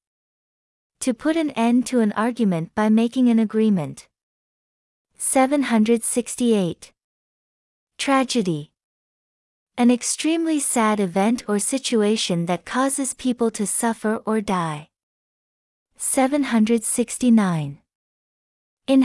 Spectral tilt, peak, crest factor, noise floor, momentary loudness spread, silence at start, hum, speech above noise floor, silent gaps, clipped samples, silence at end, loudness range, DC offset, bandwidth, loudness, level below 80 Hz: -4.5 dB/octave; -4 dBFS; 16 dB; under -90 dBFS; 8 LU; 1 s; none; over 70 dB; 4.23-5.05 s, 7.04-7.87 s, 8.84-9.67 s, 15.03-15.86 s, 17.95-18.77 s; under 0.1%; 0 s; 4 LU; under 0.1%; 12 kHz; -21 LUFS; -62 dBFS